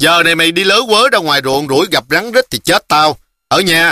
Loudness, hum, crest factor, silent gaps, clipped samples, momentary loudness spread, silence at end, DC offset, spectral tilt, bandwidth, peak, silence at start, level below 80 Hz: -11 LUFS; none; 12 dB; none; under 0.1%; 5 LU; 0 s; under 0.1%; -3 dB/octave; 16 kHz; 0 dBFS; 0 s; -48 dBFS